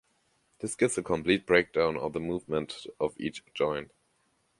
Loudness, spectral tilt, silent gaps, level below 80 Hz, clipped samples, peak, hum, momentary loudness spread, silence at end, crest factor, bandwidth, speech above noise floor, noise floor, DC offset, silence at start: -30 LUFS; -4.5 dB/octave; none; -58 dBFS; under 0.1%; -8 dBFS; none; 13 LU; 0.75 s; 22 dB; 11.5 kHz; 43 dB; -72 dBFS; under 0.1%; 0.6 s